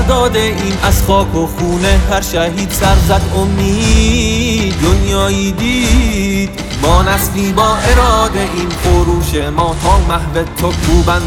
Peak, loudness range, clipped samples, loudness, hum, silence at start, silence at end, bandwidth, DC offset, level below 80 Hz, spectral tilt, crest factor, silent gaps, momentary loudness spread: 0 dBFS; 1 LU; under 0.1%; -12 LUFS; none; 0 s; 0 s; 18 kHz; under 0.1%; -16 dBFS; -5 dB/octave; 12 dB; none; 5 LU